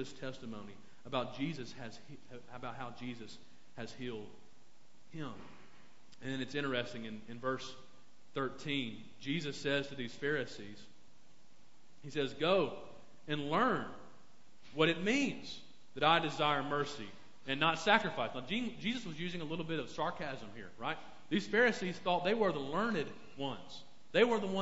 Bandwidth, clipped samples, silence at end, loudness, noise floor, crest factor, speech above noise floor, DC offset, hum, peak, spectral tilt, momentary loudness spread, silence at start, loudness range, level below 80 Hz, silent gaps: 7.6 kHz; under 0.1%; 0 s; -36 LUFS; -68 dBFS; 26 dB; 32 dB; 0.4%; none; -10 dBFS; -3 dB/octave; 22 LU; 0 s; 12 LU; -68 dBFS; none